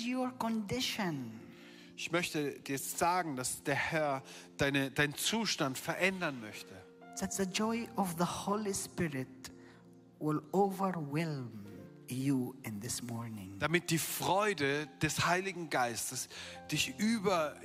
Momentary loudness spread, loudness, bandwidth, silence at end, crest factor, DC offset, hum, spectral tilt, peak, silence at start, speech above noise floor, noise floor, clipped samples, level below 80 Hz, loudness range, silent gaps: 15 LU; -35 LUFS; 16 kHz; 0 s; 20 dB; under 0.1%; none; -4 dB/octave; -16 dBFS; 0 s; 23 dB; -58 dBFS; under 0.1%; -68 dBFS; 4 LU; none